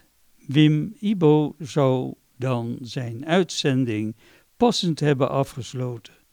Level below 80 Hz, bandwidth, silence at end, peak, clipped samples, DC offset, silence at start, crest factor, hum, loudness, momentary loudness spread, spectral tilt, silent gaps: -60 dBFS; 13.5 kHz; 0.25 s; -6 dBFS; under 0.1%; under 0.1%; 0.5 s; 18 dB; none; -23 LUFS; 12 LU; -6.5 dB/octave; none